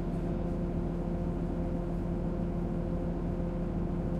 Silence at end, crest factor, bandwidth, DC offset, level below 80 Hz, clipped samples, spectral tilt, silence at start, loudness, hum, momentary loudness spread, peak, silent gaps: 0 s; 12 dB; 5.4 kHz; under 0.1%; -38 dBFS; under 0.1%; -10 dB/octave; 0 s; -34 LUFS; none; 1 LU; -20 dBFS; none